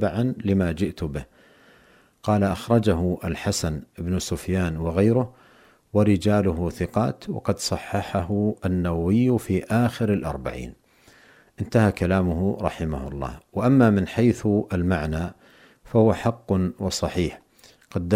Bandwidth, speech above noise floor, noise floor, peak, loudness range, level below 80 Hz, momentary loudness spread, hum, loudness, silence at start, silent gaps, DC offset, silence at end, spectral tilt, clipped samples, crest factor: 16 kHz; 34 dB; -56 dBFS; -6 dBFS; 3 LU; -42 dBFS; 11 LU; none; -24 LUFS; 0 s; none; under 0.1%; 0 s; -6.5 dB/octave; under 0.1%; 18 dB